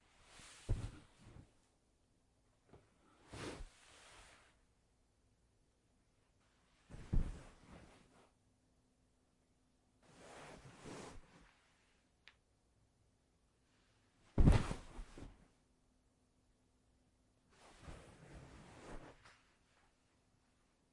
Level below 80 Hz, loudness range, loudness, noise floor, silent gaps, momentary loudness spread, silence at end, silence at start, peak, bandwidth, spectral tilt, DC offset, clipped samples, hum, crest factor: -48 dBFS; 22 LU; -42 LUFS; -77 dBFS; none; 24 LU; 1.8 s; 0.4 s; -16 dBFS; 11.5 kHz; -6.5 dB/octave; under 0.1%; under 0.1%; none; 30 dB